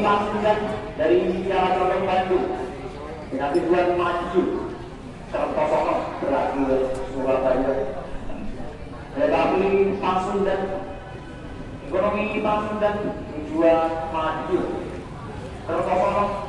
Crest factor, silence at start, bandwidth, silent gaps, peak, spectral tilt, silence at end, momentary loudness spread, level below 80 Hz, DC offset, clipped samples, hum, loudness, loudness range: 16 dB; 0 s; 11 kHz; none; -6 dBFS; -7 dB/octave; 0 s; 15 LU; -42 dBFS; under 0.1%; under 0.1%; none; -23 LUFS; 2 LU